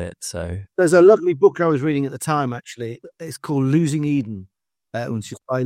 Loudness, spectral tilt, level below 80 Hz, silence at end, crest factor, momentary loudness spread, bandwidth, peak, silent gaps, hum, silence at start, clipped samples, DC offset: -19 LUFS; -6.5 dB/octave; -56 dBFS; 0 s; 18 dB; 19 LU; 15 kHz; -2 dBFS; none; none; 0 s; under 0.1%; under 0.1%